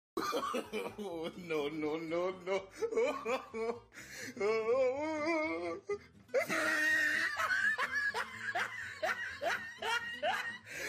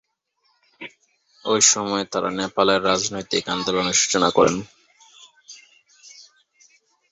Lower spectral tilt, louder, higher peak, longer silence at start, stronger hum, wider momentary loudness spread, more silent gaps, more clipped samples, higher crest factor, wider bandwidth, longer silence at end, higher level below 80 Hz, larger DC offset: about the same, -3 dB/octave vs -2 dB/octave; second, -35 LUFS vs -19 LUFS; second, -22 dBFS vs -2 dBFS; second, 0.15 s vs 0.8 s; neither; second, 11 LU vs 19 LU; neither; neither; second, 14 dB vs 22 dB; first, 15 kHz vs 8.4 kHz; second, 0 s vs 0.9 s; second, -72 dBFS vs -58 dBFS; neither